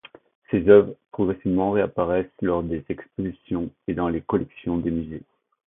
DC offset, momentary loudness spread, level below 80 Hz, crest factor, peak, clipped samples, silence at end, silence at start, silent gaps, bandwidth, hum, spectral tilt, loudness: under 0.1%; 15 LU; -46 dBFS; 22 dB; -2 dBFS; under 0.1%; 0.5 s; 0.5 s; none; 3.8 kHz; none; -12 dB/octave; -23 LUFS